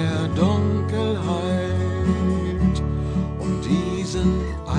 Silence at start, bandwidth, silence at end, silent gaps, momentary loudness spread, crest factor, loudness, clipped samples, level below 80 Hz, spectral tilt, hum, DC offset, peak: 0 s; 10 kHz; 0 s; none; 5 LU; 14 dB; -22 LUFS; under 0.1%; -32 dBFS; -7 dB/octave; none; under 0.1%; -8 dBFS